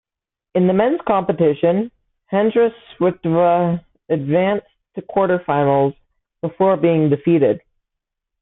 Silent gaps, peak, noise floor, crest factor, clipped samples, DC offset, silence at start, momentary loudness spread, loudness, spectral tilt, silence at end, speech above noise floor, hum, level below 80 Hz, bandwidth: none; -4 dBFS; -80 dBFS; 14 dB; under 0.1%; under 0.1%; 0.55 s; 10 LU; -18 LUFS; -12.5 dB/octave; 0.85 s; 64 dB; none; -56 dBFS; 4 kHz